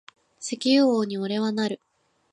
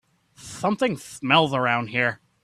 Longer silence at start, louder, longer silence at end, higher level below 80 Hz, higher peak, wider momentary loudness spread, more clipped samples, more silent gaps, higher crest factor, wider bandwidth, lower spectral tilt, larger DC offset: about the same, 0.4 s vs 0.4 s; about the same, -24 LUFS vs -23 LUFS; first, 0.6 s vs 0.3 s; second, -76 dBFS vs -62 dBFS; second, -10 dBFS vs -4 dBFS; first, 15 LU vs 10 LU; neither; neither; second, 16 dB vs 22 dB; second, 11 kHz vs 15 kHz; about the same, -4.5 dB/octave vs -4.5 dB/octave; neither